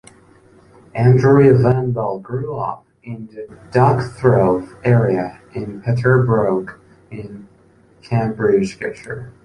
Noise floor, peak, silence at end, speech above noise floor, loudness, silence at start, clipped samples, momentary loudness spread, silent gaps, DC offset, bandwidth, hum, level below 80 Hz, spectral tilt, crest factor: -51 dBFS; -2 dBFS; 0.15 s; 35 dB; -16 LUFS; 0.95 s; under 0.1%; 21 LU; none; under 0.1%; 10 kHz; none; -48 dBFS; -9 dB/octave; 16 dB